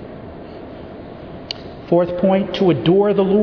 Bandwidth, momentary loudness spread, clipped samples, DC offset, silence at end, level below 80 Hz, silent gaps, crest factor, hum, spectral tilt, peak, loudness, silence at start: 5.4 kHz; 20 LU; under 0.1%; under 0.1%; 0 s; -46 dBFS; none; 16 dB; none; -8.5 dB/octave; -2 dBFS; -16 LUFS; 0 s